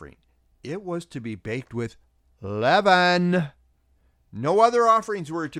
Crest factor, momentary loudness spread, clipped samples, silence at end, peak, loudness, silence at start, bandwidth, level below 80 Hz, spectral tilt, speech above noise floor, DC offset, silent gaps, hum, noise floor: 20 dB; 18 LU; under 0.1%; 0 s; -4 dBFS; -22 LUFS; 0 s; 11.5 kHz; -60 dBFS; -5.5 dB/octave; 41 dB; under 0.1%; none; none; -63 dBFS